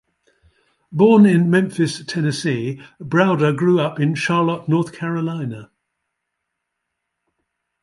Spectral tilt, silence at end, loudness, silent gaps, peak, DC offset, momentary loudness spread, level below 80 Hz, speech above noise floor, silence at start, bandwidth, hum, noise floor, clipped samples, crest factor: -7 dB/octave; 2.2 s; -18 LUFS; none; -2 dBFS; under 0.1%; 15 LU; -62 dBFS; 61 dB; 0.9 s; 11.5 kHz; none; -78 dBFS; under 0.1%; 16 dB